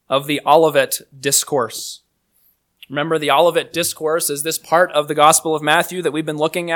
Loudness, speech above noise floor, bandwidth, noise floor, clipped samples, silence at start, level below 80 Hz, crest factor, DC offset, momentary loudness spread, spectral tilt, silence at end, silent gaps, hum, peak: -16 LUFS; 44 dB; 19 kHz; -61 dBFS; under 0.1%; 0.1 s; -68 dBFS; 18 dB; under 0.1%; 9 LU; -2.5 dB/octave; 0 s; none; none; 0 dBFS